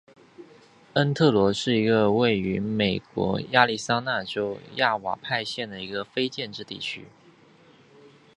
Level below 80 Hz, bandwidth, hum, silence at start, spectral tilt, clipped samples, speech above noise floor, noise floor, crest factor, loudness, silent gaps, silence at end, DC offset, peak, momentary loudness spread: -58 dBFS; 11 kHz; none; 0.4 s; -5.5 dB/octave; under 0.1%; 30 dB; -55 dBFS; 24 dB; -25 LUFS; none; 1.3 s; under 0.1%; -2 dBFS; 12 LU